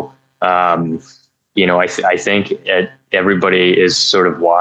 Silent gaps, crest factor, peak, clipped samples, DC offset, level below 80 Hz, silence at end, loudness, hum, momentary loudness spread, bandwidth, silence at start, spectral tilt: none; 14 dB; 0 dBFS; under 0.1%; under 0.1%; -58 dBFS; 0 s; -13 LUFS; none; 8 LU; 9 kHz; 0 s; -4 dB/octave